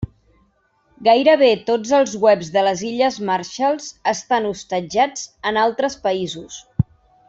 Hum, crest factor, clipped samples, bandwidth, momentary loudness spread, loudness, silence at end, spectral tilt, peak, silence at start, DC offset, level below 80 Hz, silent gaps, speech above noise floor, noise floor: none; 16 dB; under 0.1%; 8 kHz; 10 LU; -19 LUFS; 0.45 s; -4.5 dB/octave; -2 dBFS; 0 s; under 0.1%; -50 dBFS; none; 43 dB; -61 dBFS